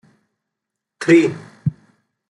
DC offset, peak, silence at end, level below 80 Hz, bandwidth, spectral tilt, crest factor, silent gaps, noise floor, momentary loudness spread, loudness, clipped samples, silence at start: under 0.1%; -2 dBFS; 0.6 s; -60 dBFS; 11 kHz; -6.5 dB/octave; 18 dB; none; -82 dBFS; 12 LU; -18 LUFS; under 0.1%; 1 s